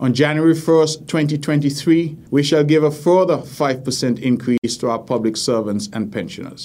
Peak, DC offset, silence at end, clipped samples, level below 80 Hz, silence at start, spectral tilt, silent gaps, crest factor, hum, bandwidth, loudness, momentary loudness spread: -2 dBFS; under 0.1%; 0 s; under 0.1%; -58 dBFS; 0 s; -5.5 dB/octave; 4.58-4.62 s; 16 dB; none; 16 kHz; -18 LUFS; 8 LU